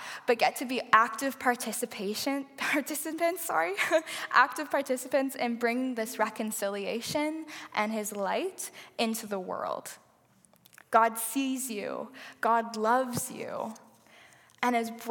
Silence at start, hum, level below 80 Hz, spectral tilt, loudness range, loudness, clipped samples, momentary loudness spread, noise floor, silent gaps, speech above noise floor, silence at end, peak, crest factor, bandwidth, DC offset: 0 s; none; -80 dBFS; -3 dB/octave; 4 LU; -30 LUFS; under 0.1%; 11 LU; -64 dBFS; none; 34 dB; 0 s; -6 dBFS; 24 dB; 17.5 kHz; under 0.1%